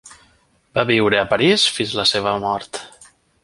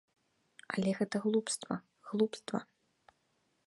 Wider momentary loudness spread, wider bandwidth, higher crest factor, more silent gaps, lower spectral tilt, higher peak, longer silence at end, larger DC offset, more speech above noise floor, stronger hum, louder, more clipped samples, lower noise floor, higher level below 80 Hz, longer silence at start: first, 11 LU vs 8 LU; about the same, 11.5 kHz vs 11.5 kHz; about the same, 18 dB vs 20 dB; neither; second, -3.5 dB/octave vs -5 dB/octave; first, -2 dBFS vs -18 dBFS; second, 0.55 s vs 1.05 s; neither; about the same, 40 dB vs 43 dB; neither; first, -17 LUFS vs -35 LUFS; neither; second, -58 dBFS vs -77 dBFS; first, -52 dBFS vs -80 dBFS; second, 0.05 s vs 0.7 s